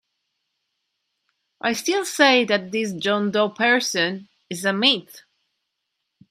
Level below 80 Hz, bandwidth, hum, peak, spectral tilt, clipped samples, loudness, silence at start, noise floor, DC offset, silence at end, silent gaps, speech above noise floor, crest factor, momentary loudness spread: -74 dBFS; 16 kHz; none; 0 dBFS; -3 dB/octave; under 0.1%; -20 LUFS; 1.65 s; -78 dBFS; under 0.1%; 1.1 s; none; 57 dB; 22 dB; 10 LU